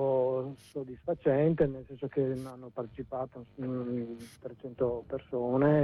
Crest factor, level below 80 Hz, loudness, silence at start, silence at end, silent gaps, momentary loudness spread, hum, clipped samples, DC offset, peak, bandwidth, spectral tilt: 16 dB; -60 dBFS; -33 LUFS; 0 s; 0 s; none; 15 LU; none; under 0.1%; under 0.1%; -14 dBFS; 12 kHz; -9 dB/octave